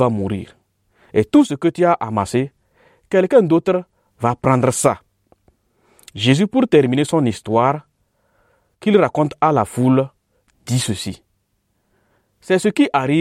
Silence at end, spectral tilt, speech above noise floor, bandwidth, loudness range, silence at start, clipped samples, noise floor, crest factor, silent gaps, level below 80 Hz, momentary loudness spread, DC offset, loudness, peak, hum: 0 s; -6 dB/octave; 51 dB; 15 kHz; 3 LU; 0 s; under 0.1%; -67 dBFS; 16 dB; none; -54 dBFS; 12 LU; under 0.1%; -17 LUFS; -2 dBFS; none